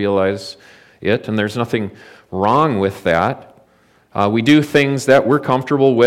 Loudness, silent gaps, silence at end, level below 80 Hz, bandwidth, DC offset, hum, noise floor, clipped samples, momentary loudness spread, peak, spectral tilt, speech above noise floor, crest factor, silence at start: -16 LUFS; none; 0 s; -54 dBFS; 15.5 kHz; under 0.1%; none; -54 dBFS; under 0.1%; 15 LU; -2 dBFS; -6 dB/octave; 38 dB; 14 dB; 0 s